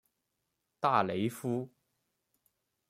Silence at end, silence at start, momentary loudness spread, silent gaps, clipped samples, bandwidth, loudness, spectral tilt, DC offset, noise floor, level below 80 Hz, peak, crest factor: 1.25 s; 0.8 s; 9 LU; none; under 0.1%; 16 kHz; -32 LUFS; -6 dB/octave; under 0.1%; -84 dBFS; -78 dBFS; -12 dBFS; 24 dB